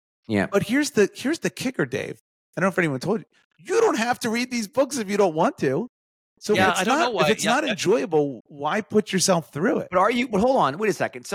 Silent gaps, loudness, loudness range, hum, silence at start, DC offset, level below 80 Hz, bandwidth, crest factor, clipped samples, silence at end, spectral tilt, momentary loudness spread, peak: 2.20-2.53 s, 3.45-3.50 s, 5.89-6.36 s, 8.40-8.45 s; -23 LUFS; 3 LU; none; 0.3 s; under 0.1%; -60 dBFS; 16.5 kHz; 16 dB; under 0.1%; 0 s; -4.5 dB/octave; 7 LU; -8 dBFS